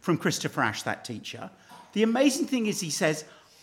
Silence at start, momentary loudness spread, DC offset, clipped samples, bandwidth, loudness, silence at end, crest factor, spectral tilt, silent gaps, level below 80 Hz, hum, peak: 0.05 s; 14 LU; under 0.1%; under 0.1%; 17 kHz; -27 LUFS; 0.3 s; 18 dB; -4 dB/octave; none; -74 dBFS; none; -10 dBFS